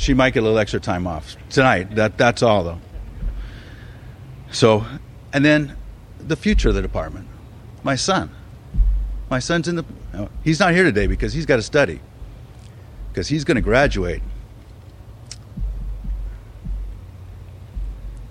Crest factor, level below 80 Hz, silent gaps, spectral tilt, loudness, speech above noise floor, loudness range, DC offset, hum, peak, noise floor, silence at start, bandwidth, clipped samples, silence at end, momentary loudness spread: 20 dB; -28 dBFS; none; -5.5 dB/octave; -20 LUFS; 22 dB; 7 LU; under 0.1%; none; 0 dBFS; -40 dBFS; 0 s; 10.5 kHz; under 0.1%; 0 s; 23 LU